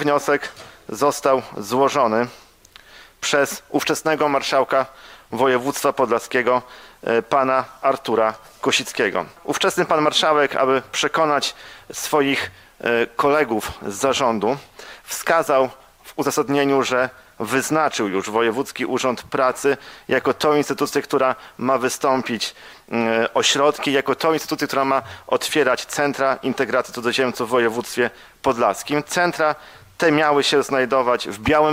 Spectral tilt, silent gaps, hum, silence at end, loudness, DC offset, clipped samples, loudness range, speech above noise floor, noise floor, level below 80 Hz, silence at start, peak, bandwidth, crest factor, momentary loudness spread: -3.5 dB/octave; none; none; 0 s; -20 LUFS; under 0.1%; under 0.1%; 2 LU; 28 dB; -48 dBFS; -54 dBFS; 0 s; -2 dBFS; 16 kHz; 20 dB; 8 LU